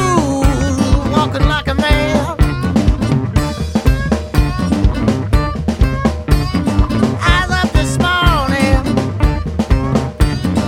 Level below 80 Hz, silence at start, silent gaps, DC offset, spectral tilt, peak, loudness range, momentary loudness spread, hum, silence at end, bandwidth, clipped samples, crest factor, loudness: -18 dBFS; 0 s; none; under 0.1%; -6 dB/octave; 0 dBFS; 2 LU; 4 LU; none; 0 s; 15.5 kHz; under 0.1%; 14 dB; -15 LUFS